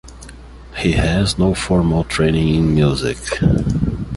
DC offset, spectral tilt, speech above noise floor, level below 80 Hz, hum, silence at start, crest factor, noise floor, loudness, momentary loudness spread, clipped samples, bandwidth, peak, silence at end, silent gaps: under 0.1%; -6 dB/octave; 21 dB; -28 dBFS; none; 0.05 s; 14 dB; -36 dBFS; -17 LUFS; 6 LU; under 0.1%; 11.5 kHz; -2 dBFS; 0 s; none